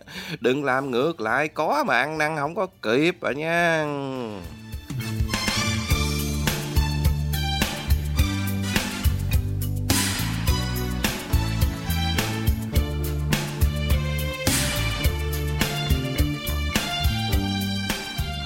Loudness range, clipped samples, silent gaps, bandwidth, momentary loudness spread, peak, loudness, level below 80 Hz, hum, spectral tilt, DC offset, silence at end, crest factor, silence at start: 2 LU; under 0.1%; none; 16.5 kHz; 6 LU; -4 dBFS; -24 LUFS; -30 dBFS; none; -4.5 dB/octave; under 0.1%; 0 s; 18 dB; 0.05 s